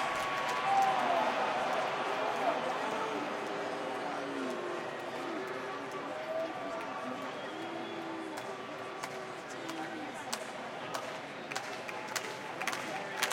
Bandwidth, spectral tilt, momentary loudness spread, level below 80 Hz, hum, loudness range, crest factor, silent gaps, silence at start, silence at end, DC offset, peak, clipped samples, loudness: 16.5 kHz; -3 dB/octave; 10 LU; -78 dBFS; none; 8 LU; 26 dB; none; 0 s; 0 s; under 0.1%; -10 dBFS; under 0.1%; -36 LUFS